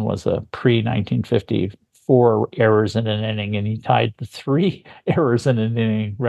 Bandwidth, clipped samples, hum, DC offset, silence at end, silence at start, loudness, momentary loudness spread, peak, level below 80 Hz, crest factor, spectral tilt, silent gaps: 11.5 kHz; under 0.1%; none; under 0.1%; 0 s; 0 s; -20 LUFS; 8 LU; -2 dBFS; -48 dBFS; 18 dB; -7.5 dB/octave; none